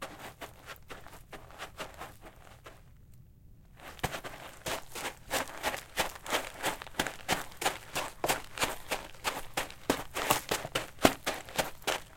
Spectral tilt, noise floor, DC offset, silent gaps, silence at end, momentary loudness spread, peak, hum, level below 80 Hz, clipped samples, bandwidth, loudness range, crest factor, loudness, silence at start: -2.5 dB/octave; -55 dBFS; under 0.1%; none; 0 s; 19 LU; -2 dBFS; none; -54 dBFS; under 0.1%; 17 kHz; 15 LU; 34 dB; -34 LUFS; 0 s